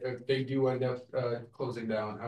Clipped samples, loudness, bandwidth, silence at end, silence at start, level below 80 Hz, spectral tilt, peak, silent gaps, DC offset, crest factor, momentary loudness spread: under 0.1%; -33 LUFS; 9.8 kHz; 0 s; 0 s; -76 dBFS; -8 dB/octave; -16 dBFS; none; under 0.1%; 16 dB; 7 LU